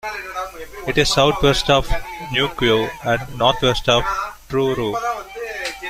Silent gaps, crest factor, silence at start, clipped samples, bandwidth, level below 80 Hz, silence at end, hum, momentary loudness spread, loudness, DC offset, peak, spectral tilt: none; 18 dB; 0.05 s; under 0.1%; 16 kHz; -32 dBFS; 0 s; none; 13 LU; -19 LUFS; under 0.1%; 0 dBFS; -4 dB/octave